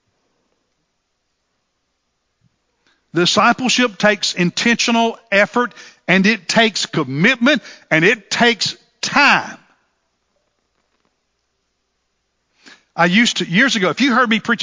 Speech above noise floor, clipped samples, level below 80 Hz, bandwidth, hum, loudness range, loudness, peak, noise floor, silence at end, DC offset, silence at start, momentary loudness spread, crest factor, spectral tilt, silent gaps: 55 dB; under 0.1%; -64 dBFS; 7.8 kHz; none; 6 LU; -15 LUFS; 0 dBFS; -70 dBFS; 0 s; under 0.1%; 3.15 s; 7 LU; 18 dB; -3.5 dB/octave; none